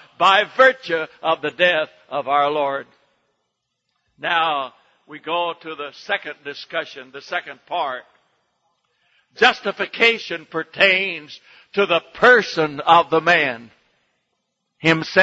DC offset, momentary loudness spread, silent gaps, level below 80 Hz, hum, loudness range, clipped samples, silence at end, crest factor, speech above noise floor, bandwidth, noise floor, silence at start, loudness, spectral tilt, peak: under 0.1%; 16 LU; none; -66 dBFS; none; 10 LU; under 0.1%; 0 s; 20 dB; 56 dB; 8 kHz; -75 dBFS; 0.2 s; -18 LUFS; -4 dB/octave; 0 dBFS